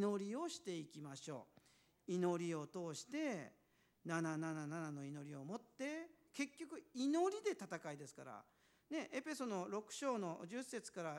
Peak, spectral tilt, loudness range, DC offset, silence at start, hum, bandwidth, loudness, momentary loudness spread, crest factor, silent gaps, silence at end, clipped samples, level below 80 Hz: -26 dBFS; -5 dB/octave; 2 LU; under 0.1%; 0 s; none; 16 kHz; -46 LUFS; 13 LU; 18 dB; none; 0 s; under 0.1%; under -90 dBFS